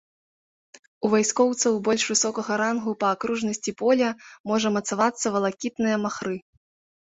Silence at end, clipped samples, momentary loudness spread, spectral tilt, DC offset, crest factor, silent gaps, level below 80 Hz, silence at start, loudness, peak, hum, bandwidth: 0.65 s; under 0.1%; 7 LU; -3.5 dB/octave; under 0.1%; 18 dB; 4.40-4.44 s; -66 dBFS; 1 s; -24 LUFS; -6 dBFS; none; 8.4 kHz